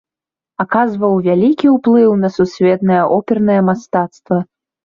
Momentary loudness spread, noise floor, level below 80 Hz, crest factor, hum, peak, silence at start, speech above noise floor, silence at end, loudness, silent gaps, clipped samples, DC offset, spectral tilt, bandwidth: 8 LU; -88 dBFS; -54 dBFS; 12 dB; none; -2 dBFS; 0.6 s; 76 dB; 0.4 s; -14 LUFS; none; under 0.1%; under 0.1%; -8.5 dB/octave; 7.2 kHz